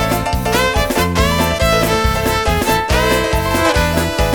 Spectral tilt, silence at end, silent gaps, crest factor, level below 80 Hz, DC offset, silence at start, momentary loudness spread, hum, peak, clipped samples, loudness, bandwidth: -4.5 dB/octave; 0 s; none; 14 dB; -22 dBFS; under 0.1%; 0 s; 2 LU; none; 0 dBFS; under 0.1%; -15 LUFS; over 20 kHz